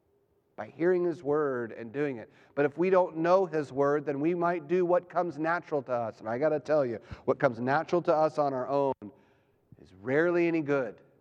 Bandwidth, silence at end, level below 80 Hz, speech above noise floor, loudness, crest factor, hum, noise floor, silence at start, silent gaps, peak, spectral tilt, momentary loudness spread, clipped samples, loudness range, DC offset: 7.6 kHz; 0.3 s; -68 dBFS; 42 dB; -29 LUFS; 20 dB; none; -70 dBFS; 0.6 s; none; -10 dBFS; -8 dB/octave; 10 LU; under 0.1%; 2 LU; under 0.1%